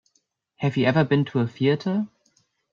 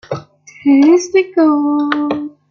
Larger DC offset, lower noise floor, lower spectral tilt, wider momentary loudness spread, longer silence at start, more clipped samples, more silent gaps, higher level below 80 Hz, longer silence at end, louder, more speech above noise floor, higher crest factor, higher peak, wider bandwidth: neither; first, -71 dBFS vs -33 dBFS; first, -8 dB/octave vs -5 dB/octave; second, 8 LU vs 13 LU; first, 0.6 s vs 0.1 s; neither; neither; about the same, -62 dBFS vs -60 dBFS; first, 0.65 s vs 0.2 s; second, -23 LUFS vs -13 LUFS; first, 49 dB vs 21 dB; first, 18 dB vs 12 dB; second, -8 dBFS vs -2 dBFS; about the same, 7.2 kHz vs 7.2 kHz